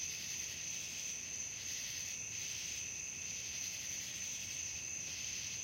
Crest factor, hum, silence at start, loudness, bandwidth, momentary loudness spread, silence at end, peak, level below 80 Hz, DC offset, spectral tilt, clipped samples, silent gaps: 14 dB; none; 0 s; -40 LUFS; 16.5 kHz; 1 LU; 0 s; -30 dBFS; -70 dBFS; under 0.1%; 0.5 dB/octave; under 0.1%; none